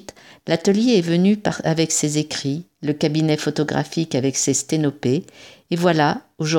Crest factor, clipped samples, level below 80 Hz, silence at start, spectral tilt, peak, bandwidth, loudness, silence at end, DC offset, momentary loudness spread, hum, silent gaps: 16 dB; under 0.1%; -60 dBFS; 0.45 s; -4.5 dB/octave; -4 dBFS; 17 kHz; -20 LUFS; 0 s; under 0.1%; 8 LU; none; none